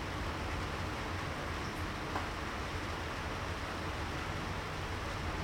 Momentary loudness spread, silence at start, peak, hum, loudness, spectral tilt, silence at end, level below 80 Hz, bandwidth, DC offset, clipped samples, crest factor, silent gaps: 1 LU; 0 s; -22 dBFS; none; -39 LUFS; -5 dB/octave; 0 s; -46 dBFS; 17 kHz; under 0.1%; under 0.1%; 16 dB; none